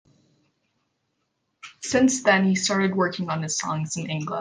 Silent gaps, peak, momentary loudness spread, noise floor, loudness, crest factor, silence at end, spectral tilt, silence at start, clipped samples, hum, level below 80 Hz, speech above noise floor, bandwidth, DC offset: none; -4 dBFS; 9 LU; -75 dBFS; -23 LUFS; 20 dB; 0 s; -4 dB/octave; 1.65 s; under 0.1%; none; -62 dBFS; 52 dB; 10 kHz; under 0.1%